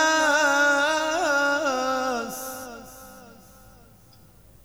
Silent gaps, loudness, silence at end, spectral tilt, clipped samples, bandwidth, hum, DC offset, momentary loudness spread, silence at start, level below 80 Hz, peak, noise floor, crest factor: none; -22 LUFS; 1.35 s; -1.5 dB/octave; under 0.1%; over 20 kHz; none; under 0.1%; 21 LU; 0 s; -60 dBFS; -8 dBFS; -53 dBFS; 16 dB